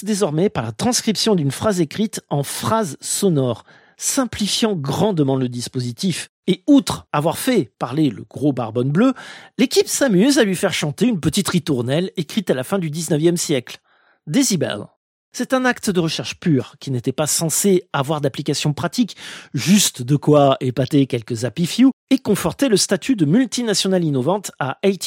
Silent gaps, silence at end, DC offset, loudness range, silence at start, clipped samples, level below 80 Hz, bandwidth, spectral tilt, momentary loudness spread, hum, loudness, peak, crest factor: 6.29-6.43 s, 14.96-15.32 s, 21.93-22.07 s; 0 s; under 0.1%; 3 LU; 0 s; under 0.1%; -54 dBFS; 16.5 kHz; -4.5 dB/octave; 8 LU; none; -19 LUFS; -2 dBFS; 16 dB